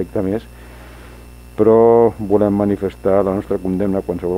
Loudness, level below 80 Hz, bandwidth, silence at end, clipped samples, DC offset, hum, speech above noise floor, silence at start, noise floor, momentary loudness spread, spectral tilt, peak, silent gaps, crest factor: -16 LUFS; -40 dBFS; 15 kHz; 0 s; under 0.1%; under 0.1%; 60 Hz at -40 dBFS; 22 dB; 0 s; -38 dBFS; 10 LU; -9 dB/octave; 0 dBFS; none; 16 dB